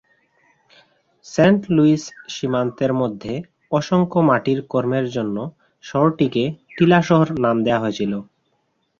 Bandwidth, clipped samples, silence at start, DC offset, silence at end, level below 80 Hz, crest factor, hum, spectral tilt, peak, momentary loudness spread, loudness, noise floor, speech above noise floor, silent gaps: 7.6 kHz; under 0.1%; 1.25 s; under 0.1%; 0.75 s; -56 dBFS; 18 dB; none; -7 dB/octave; -2 dBFS; 12 LU; -19 LUFS; -68 dBFS; 50 dB; none